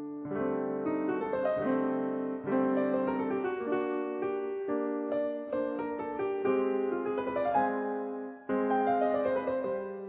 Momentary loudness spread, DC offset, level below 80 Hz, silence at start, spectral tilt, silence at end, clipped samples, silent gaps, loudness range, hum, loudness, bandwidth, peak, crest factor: 6 LU; under 0.1%; -68 dBFS; 0 s; -6 dB/octave; 0 s; under 0.1%; none; 2 LU; none; -32 LUFS; 4 kHz; -16 dBFS; 16 dB